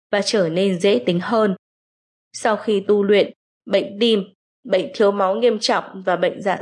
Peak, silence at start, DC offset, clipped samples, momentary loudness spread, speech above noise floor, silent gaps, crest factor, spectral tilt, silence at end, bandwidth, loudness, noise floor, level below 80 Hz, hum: -4 dBFS; 0.1 s; under 0.1%; under 0.1%; 6 LU; over 72 dB; 1.59-2.31 s, 3.36-3.61 s, 4.35-4.63 s; 14 dB; -5 dB/octave; 0 s; 11 kHz; -19 LUFS; under -90 dBFS; -74 dBFS; none